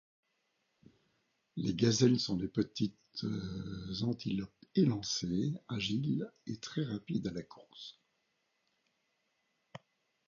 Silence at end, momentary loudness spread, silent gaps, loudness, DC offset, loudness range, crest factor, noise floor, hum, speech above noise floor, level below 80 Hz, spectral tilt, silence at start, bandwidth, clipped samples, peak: 0.5 s; 20 LU; none; -35 LUFS; under 0.1%; 9 LU; 22 dB; -80 dBFS; none; 46 dB; -64 dBFS; -6.5 dB/octave; 1.55 s; 7.2 kHz; under 0.1%; -14 dBFS